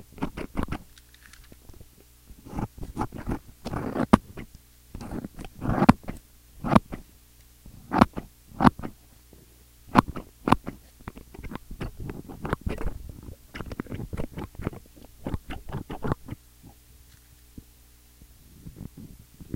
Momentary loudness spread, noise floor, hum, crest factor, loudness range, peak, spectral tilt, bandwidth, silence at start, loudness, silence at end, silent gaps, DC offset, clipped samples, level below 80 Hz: 25 LU; -55 dBFS; none; 30 dB; 12 LU; 0 dBFS; -7 dB/octave; 16.5 kHz; 0 s; -28 LUFS; 0 s; none; under 0.1%; under 0.1%; -42 dBFS